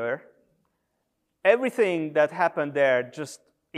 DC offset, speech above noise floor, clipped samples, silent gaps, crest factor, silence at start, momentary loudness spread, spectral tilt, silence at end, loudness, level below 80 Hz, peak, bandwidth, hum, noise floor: under 0.1%; 53 dB; under 0.1%; none; 20 dB; 0 s; 13 LU; -5 dB/octave; 0 s; -24 LUFS; -82 dBFS; -6 dBFS; 13.5 kHz; none; -77 dBFS